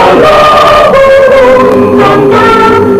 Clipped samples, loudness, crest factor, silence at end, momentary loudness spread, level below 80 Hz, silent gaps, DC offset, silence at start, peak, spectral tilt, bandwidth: 8%; -3 LUFS; 2 dB; 0 s; 2 LU; -28 dBFS; none; under 0.1%; 0 s; 0 dBFS; -5.5 dB/octave; 15.5 kHz